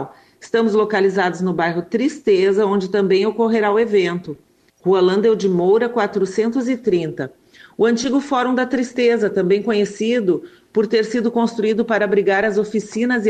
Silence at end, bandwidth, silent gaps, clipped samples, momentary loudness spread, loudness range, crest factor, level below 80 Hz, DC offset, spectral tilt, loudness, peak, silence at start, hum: 0 s; 9.2 kHz; none; under 0.1%; 7 LU; 2 LU; 12 dB; -60 dBFS; under 0.1%; -6 dB/octave; -18 LUFS; -6 dBFS; 0 s; none